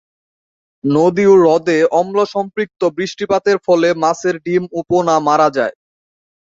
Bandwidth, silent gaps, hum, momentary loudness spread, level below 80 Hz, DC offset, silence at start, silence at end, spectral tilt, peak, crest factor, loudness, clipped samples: 7.8 kHz; none; none; 10 LU; -58 dBFS; under 0.1%; 0.85 s; 0.8 s; -6 dB/octave; 0 dBFS; 14 dB; -15 LUFS; under 0.1%